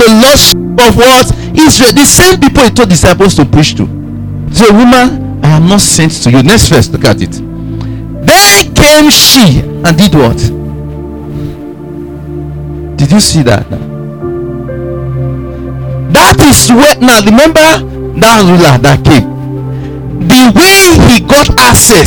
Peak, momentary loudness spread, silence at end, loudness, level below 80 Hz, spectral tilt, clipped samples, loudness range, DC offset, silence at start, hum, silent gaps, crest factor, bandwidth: 0 dBFS; 18 LU; 0 s; -4 LUFS; -22 dBFS; -4 dB/octave; 9%; 8 LU; 0.8%; 0 s; none; none; 6 dB; over 20 kHz